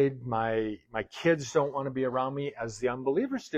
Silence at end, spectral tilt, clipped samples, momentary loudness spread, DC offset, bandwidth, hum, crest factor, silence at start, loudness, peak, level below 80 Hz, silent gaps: 0 s; -6 dB/octave; under 0.1%; 7 LU; under 0.1%; 8.8 kHz; none; 16 dB; 0 s; -30 LUFS; -12 dBFS; -60 dBFS; none